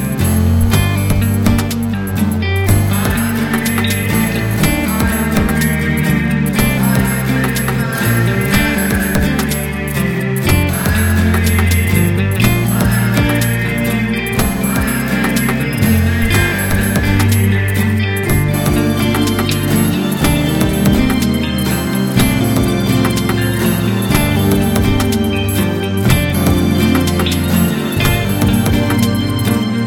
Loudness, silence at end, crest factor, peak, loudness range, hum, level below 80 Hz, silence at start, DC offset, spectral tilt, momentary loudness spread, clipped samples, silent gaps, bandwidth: -14 LUFS; 0 s; 14 dB; 0 dBFS; 1 LU; none; -26 dBFS; 0 s; 0.2%; -5.5 dB/octave; 3 LU; under 0.1%; none; 19.5 kHz